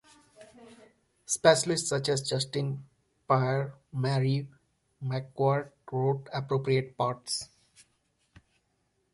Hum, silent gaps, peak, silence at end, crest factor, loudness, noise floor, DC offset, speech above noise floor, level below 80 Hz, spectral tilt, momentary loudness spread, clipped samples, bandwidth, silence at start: none; none; -6 dBFS; 1.7 s; 24 dB; -29 LUFS; -75 dBFS; under 0.1%; 46 dB; -68 dBFS; -4.5 dB/octave; 11 LU; under 0.1%; 11.5 kHz; 0.4 s